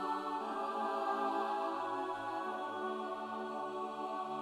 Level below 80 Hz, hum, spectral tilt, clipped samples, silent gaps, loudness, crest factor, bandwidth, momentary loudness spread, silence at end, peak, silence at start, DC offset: -82 dBFS; none; -4.5 dB/octave; under 0.1%; none; -39 LUFS; 14 dB; 15 kHz; 5 LU; 0 s; -24 dBFS; 0 s; under 0.1%